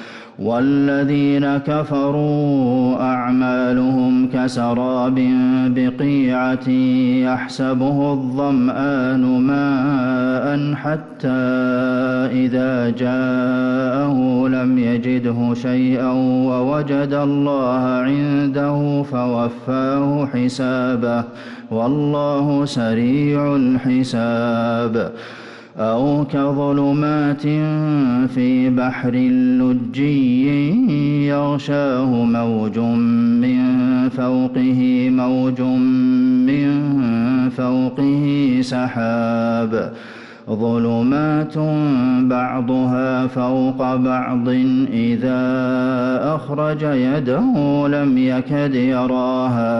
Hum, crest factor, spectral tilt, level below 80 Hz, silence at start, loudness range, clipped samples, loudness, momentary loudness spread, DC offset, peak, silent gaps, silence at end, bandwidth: none; 8 dB; -8.5 dB/octave; -54 dBFS; 0 s; 2 LU; under 0.1%; -17 LUFS; 4 LU; under 0.1%; -8 dBFS; none; 0 s; 7.8 kHz